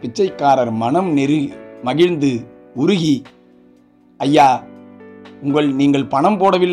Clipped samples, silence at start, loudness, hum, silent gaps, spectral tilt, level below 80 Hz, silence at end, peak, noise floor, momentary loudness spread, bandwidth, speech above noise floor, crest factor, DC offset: under 0.1%; 0.05 s; -16 LUFS; none; none; -6.5 dB/octave; -58 dBFS; 0 s; -2 dBFS; -50 dBFS; 10 LU; 10.5 kHz; 35 dB; 14 dB; under 0.1%